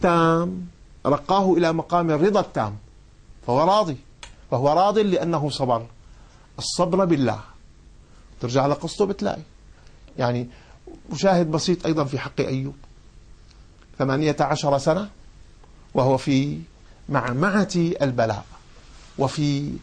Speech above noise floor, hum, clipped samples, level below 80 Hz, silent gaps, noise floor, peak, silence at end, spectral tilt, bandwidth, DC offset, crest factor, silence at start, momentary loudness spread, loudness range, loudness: 27 dB; none; under 0.1%; -48 dBFS; none; -48 dBFS; -6 dBFS; 0 s; -6 dB/octave; 10 kHz; under 0.1%; 16 dB; 0 s; 15 LU; 4 LU; -22 LUFS